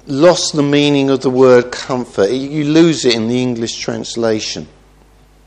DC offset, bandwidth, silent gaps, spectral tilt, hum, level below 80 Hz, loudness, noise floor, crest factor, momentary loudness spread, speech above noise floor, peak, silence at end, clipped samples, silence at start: under 0.1%; 10.5 kHz; none; -5 dB/octave; none; -48 dBFS; -13 LUFS; -46 dBFS; 14 dB; 10 LU; 33 dB; 0 dBFS; 0.8 s; under 0.1%; 0.05 s